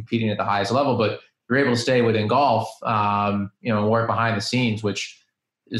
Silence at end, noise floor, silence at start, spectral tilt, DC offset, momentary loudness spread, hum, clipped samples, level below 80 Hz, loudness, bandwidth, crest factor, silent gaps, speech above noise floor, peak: 0 s; -52 dBFS; 0 s; -6 dB/octave; under 0.1%; 6 LU; none; under 0.1%; -62 dBFS; -22 LUFS; 12 kHz; 14 dB; none; 31 dB; -8 dBFS